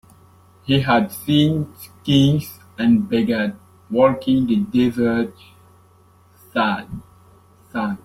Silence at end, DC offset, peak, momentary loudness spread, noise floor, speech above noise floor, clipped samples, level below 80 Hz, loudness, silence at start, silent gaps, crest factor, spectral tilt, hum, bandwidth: 0.1 s; under 0.1%; -2 dBFS; 14 LU; -52 dBFS; 34 dB; under 0.1%; -52 dBFS; -19 LUFS; 0.65 s; none; 18 dB; -6.5 dB/octave; none; 16 kHz